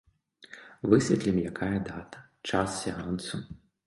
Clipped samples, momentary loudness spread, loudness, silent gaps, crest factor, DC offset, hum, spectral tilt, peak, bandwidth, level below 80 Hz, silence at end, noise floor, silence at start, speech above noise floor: under 0.1%; 24 LU; -29 LUFS; none; 24 dB; under 0.1%; none; -5.5 dB/octave; -6 dBFS; 11.5 kHz; -54 dBFS; 0.3 s; -54 dBFS; 0.5 s; 25 dB